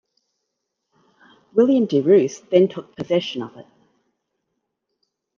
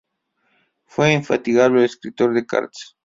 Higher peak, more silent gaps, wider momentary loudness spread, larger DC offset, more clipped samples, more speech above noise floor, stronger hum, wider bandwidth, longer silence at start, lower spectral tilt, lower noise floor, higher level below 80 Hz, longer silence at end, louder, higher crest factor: about the same, -2 dBFS vs -2 dBFS; neither; first, 15 LU vs 8 LU; neither; neither; first, 60 dB vs 50 dB; neither; about the same, 7.2 kHz vs 7.8 kHz; first, 1.55 s vs 1 s; about the same, -6.5 dB/octave vs -6 dB/octave; first, -78 dBFS vs -68 dBFS; second, -72 dBFS vs -62 dBFS; first, 1.75 s vs 0.2 s; about the same, -19 LUFS vs -18 LUFS; about the same, 20 dB vs 18 dB